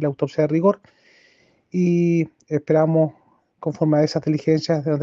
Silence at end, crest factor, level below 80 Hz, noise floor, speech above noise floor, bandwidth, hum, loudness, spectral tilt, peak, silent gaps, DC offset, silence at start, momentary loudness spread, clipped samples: 0 s; 16 dB; -66 dBFS; -58 dBFS; 39 dB; 7.4 kHz; none; -21 LUFS; -8 dB/octave; -4 dBFS; none; under 0.1%; 0 s; 9 LU; under 0.1%